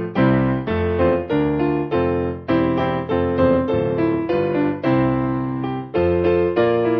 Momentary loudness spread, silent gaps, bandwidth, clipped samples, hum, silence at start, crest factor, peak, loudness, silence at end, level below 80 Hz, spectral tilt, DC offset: 4 LU; none; 5.6 kHz; under 0.1%; none; 0 s; 14 dB; -4 dBFS; -19 LUFS; 0 s; -36 dBFS; -10.5 dB/octave; under 0.1%